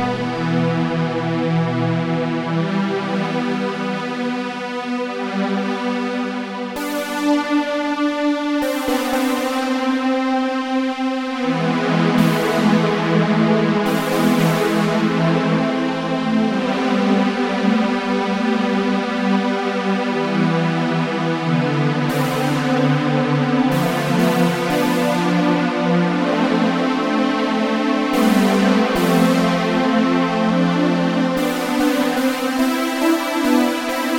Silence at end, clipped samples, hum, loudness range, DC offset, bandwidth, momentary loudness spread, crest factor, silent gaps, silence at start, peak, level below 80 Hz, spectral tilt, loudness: 0 s; under 0.1%; none; 5 LU; under 0.1%; 16.5 kHz; 5 LU; 14 dB; none; 0 s; -4 dBFS; -54 dBFS; -6 dB/octave; -18 LUFS